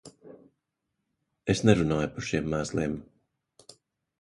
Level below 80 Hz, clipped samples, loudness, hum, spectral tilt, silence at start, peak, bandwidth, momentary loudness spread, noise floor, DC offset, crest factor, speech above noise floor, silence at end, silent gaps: -50 dBFS; under 0.1%; -27 LUFS; none; -6 dB/octave; 0.05 s; -4 dBFS; 11.5 kHz; 11 LU; -82 dBFS; under 0.1%; 26 dB; 56 dB; 1.2 s; none